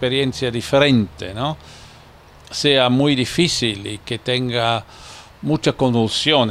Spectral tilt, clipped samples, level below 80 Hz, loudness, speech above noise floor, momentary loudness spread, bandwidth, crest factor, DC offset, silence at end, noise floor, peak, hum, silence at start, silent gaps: -5 dB/octave; under 0.1%; -46 dBFS; -18 LUFS; 26 dB; 14 LU; 14 kHz; 18 dB; under 0.1%; 0 s; -45 dBFS; 0 dBFS; none; 0 s; none